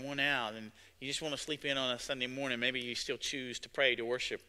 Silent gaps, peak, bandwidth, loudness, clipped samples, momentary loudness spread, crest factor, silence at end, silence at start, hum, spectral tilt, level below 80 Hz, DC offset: none; -14 dBFS; 16 kHz; -35 LUFS; under 0.1%; 10 LU; 22 dB; 0.1 s; 0 s; none; -2.5 dB/octave; -68 dBFS; under 0.1%